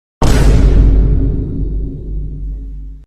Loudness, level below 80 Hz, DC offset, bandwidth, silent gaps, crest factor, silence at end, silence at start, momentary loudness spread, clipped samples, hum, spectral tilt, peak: -14 LUFS; -12 dBFS; under 0.1%; 11 kHz; none; 12 dB; 0.05 s; 0.2 s; 16 LU; 0.2%; none; -7 dB/octave; 0 dBFS